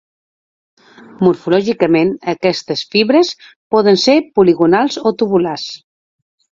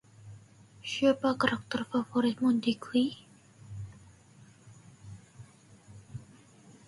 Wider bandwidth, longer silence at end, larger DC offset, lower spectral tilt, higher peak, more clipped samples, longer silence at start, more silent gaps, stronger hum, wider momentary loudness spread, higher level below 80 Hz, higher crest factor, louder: second, 7.6 kHz vs 11.5 kHz; first, 0.8 s vs 0.65 s; neither; about the same, -5.5 dB/octave vs -5.5 dB/octave; first, 0 dBFS vs -12 dBFS; neither; first, 1.2 s vs 0.25 s; first, 3.56-3.70 s vs none; neither; second, 9 LU vs 24 LU; first, -56 dBFS vs -66 dBFS; second, 14 dB vs 22 dB; first, -14 LUFS vs -29 LUFS